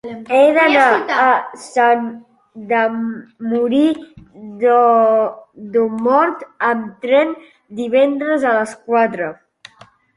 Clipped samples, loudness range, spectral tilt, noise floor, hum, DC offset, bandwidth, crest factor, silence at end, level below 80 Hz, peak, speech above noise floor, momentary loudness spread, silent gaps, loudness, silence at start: under 0.1%; 3 LU; -5 dB/octave; -48 dBFS; none; under 0.1%; 11.5 kHz; 16 dB; 0.85 s; -62 dBFS; 0 dBFS; 32 dB; 15 LU; none; -15 LUFS; 0.05 s